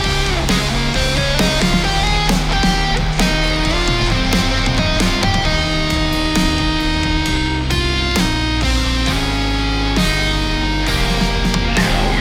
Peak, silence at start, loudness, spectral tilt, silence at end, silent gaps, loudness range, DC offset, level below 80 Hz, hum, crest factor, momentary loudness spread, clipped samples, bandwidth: -2 dBFS; 0 s; -16 LUFS; -4 dB/octave; 0 s; none; 1 LU; 0.2%; -20 dBFS; none; 14 dB; 2 LU; under 0.1%; 17 kHz